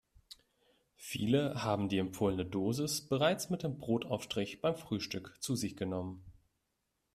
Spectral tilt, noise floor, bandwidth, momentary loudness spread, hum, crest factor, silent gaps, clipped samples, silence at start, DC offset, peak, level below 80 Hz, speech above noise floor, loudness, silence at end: -5 dB/octave; -83 dBFS; 14.5 kHz; 15 LU; none; 18 dB; none; under 0.1%; 1 s; under 0.1%; -18 dBFS; -66 dBFS; 48 dB; -35 LUFS; 0.85 s